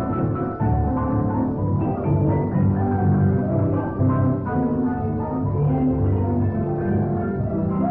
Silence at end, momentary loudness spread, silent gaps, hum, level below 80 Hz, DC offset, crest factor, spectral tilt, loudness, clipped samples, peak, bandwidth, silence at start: 0 s; 4 LU; none; none; -36 dBFS; under 0.1%; 12 dB; -12 dB/octave; -22 LUFS; under 0.1%; -8 dBFS; 2.9 kHz; 0 s